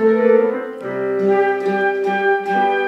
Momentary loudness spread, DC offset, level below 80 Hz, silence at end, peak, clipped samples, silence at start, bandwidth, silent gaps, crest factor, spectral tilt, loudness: 9 LU; under 0.1%; -72 dBFS; 0 s; -2 dBFS; under 0.1%; 0 s; 7.6 kHz; none; 14 dB; -7 dB/octave; -17 LUFS